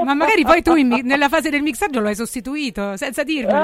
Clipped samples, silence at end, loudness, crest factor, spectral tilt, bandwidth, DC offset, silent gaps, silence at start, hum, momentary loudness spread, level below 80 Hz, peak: under 0.1%; 0 s; -17 LUFS; 16 dB; -4 dB/octave; 16.5 kHz; under 0.1%; none; 0 s; none; 11 LU; -44 dBFS; 0 dBFS